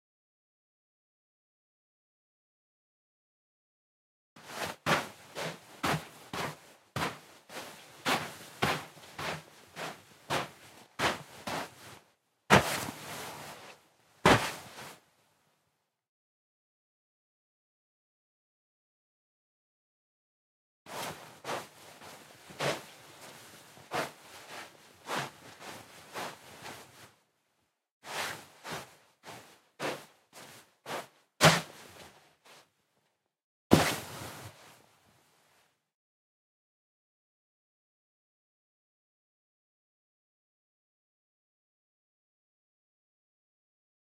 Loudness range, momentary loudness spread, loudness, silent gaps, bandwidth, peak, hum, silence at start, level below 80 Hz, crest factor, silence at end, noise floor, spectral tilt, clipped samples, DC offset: 14 LU; 25 LU; -33 LUFS; 16.09-20.86 s, 27.91-28.01 s, 33.44-33.70 s; 16 kHz; -4 dBFS; none; 4.35 s; -64 dBFS; 34 dB; 9.45 s; -80 dBFS; -3.5 dB/octave; under 0.1%; under 0.1%